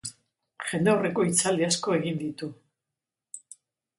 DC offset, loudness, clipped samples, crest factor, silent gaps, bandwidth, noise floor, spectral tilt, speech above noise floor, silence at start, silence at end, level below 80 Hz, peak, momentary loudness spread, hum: under 0.1%; -26 LUFS; under 0.1%; 18 dB; none; 11.5 kHz; -88 dBFS; -4 dB/octave; 63 dB; 0.05 s; 0.6 s; -68 dBFS; -10 dBFS; 20 LU; none